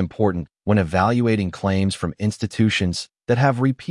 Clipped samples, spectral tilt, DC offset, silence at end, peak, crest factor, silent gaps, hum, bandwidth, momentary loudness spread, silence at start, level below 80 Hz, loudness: under 0.1%; -6.5 dB/octave; under 0.1%; 0 s; -4 dBFS; 16 dB; none; none; 11.5 kHz; 6 LU; 0 s; -50 dBFS; -21 LUFS